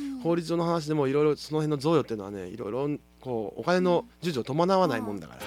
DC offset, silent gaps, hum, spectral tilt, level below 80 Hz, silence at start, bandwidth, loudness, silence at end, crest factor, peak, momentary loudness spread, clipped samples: under 0.1%; none; none; -6.5 dB/octave; -60 dBFS; 0 s; 15.5 kHz; -28 LUFS; 0 s; 18 dB; -10 dBFS; 11 LU; under 0.1%